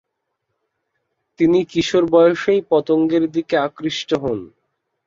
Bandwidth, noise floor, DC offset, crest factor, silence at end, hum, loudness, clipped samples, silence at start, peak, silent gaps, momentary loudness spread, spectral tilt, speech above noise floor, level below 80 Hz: 7.6 kHz; -75 dBFS; under 0.1%; 16 dB; 0.6 s; none; -17 LUFS; under 0.1%; 1.4 s; -2 dBFS; none; 8 LU; -5.5 dB/octave; 59 dB; -56 dBFS